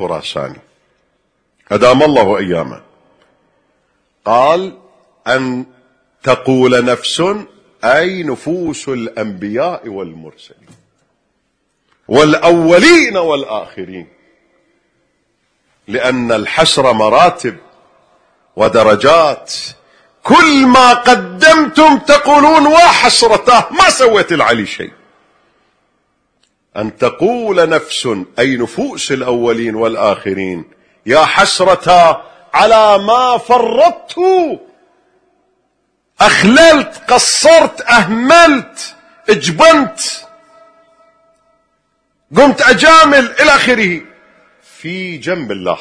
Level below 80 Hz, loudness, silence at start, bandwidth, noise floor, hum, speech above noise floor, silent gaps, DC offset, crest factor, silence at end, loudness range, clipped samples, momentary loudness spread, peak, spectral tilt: -44 dBFS; -9 LUFS; 0 s; 11 kHz; -64 dBFS; none; 54 dB; none; under 0.1%; 12 dB; 0 s; 10 LU; 0.6%; 17 LU; 0 dBFS; -3.5 dB/octave